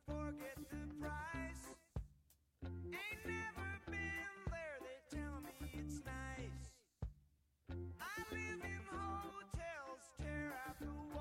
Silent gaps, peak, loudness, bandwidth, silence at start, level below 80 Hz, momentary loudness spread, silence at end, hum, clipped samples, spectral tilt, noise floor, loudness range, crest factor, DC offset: none; -32 dBFS; -49 LUFS; 16.5 kHz; 0.05 s; -56 dBFS; 8 LU; 0 s; none; under 0.1%; -5.5 dB/octave; -75 dBFS; 3 LU; 16 dB; under 0.1%